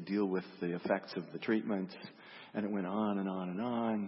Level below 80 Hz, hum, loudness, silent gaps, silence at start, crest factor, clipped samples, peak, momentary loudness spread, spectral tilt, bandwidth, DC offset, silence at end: -82 dBFS; none; -37 LUFS; none; 0 s; 18 dB; under 0.1%; -20 dBFS; 10 LU; -6 dB/octave; 5.8 kHz; under 0.1%; 0 s